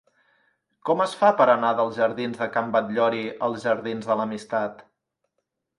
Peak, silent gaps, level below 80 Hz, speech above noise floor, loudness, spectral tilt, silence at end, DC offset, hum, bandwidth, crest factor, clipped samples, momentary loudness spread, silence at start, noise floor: -4 dBFS; none; -72 dBFS; 56 dB; -23 LUFS; -5.5 dB/octave; 0.95 s; under 0.1%; none; 11.5 kHz; 20 dB; under 0.1%; 9 LU; 0.85 s; -79 dBFS